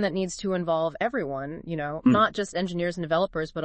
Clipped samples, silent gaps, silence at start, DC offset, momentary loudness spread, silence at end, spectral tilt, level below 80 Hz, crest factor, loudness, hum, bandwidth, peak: under 0.1%; none; 0 s; under 0.1%; 10 LU; 0 s; -5.5 dB/octave; -54 dBFS; 16 dB; -26 LUFS; none; 8.8 kHz; -10 dBFS